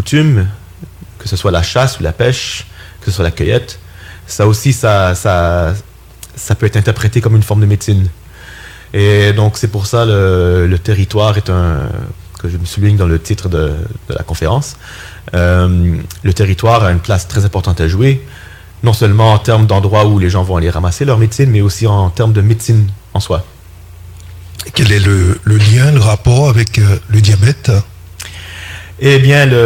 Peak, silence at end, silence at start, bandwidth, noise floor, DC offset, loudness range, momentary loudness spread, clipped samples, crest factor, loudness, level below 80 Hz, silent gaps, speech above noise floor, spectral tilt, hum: 0 dBFS; 0 s; 0 s; 15.5 kHz; -33 dBFS; under 0.1%; 5 LU; 16 LU; under 0.1%; 10 dB; -11 LUFS; -30 dBFS; none; 23 dB; -6 dB/octave; none